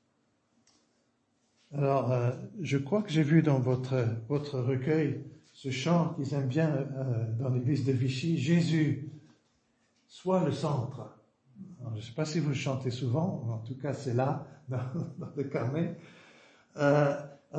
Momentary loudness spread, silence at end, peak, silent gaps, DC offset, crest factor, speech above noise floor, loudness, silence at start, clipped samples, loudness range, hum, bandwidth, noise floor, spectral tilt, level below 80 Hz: 12 LU; 0 s; -12 dBFS; none; under 0.1%; 20 dB; 44 dB; -31 LUFS; 1.7 s; under 0.1%; 5 LU; none; 8.6 kHz; -73 dBFS; -7.5 dB/octave; -70 dBFS